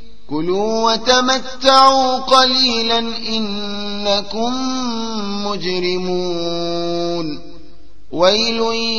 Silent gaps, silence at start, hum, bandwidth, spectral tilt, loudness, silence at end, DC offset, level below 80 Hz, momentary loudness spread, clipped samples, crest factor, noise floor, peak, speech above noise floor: none; 0.3 s; none; 10.5 kHz; -3.5 dB/octave; -16 LUFS; 0 s; 5%; -46 dBFS; 11 LU; under 0.1%; 18 dB; -45 dBFS; 0 dBFS; 29 dB